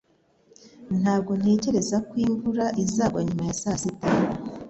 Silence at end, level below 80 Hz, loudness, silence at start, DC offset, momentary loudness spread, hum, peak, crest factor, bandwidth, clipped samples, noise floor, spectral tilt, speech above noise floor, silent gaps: 0 s; -52 dBFS; -25 LUFS; 0.65 s; under 0.1%; 5 LU; none; -10 dBFS; 16 dB; 8.2 kHz; under 0.1%; -62 dBFS; -6 dB/octave; 38 dB; none